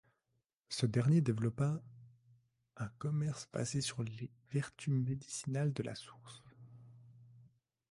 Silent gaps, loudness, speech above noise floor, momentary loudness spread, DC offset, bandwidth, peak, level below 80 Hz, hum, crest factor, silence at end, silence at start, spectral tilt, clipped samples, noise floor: none; -37 LUFS; 47 dB; 20 LU; under 0.1%; 11.5 kHz; -20 dBFS; -70 dBFS; none; 20 dB; 0.5 s; 0.7 s; -6 dB/octave; under 0.1%; -84 dBFS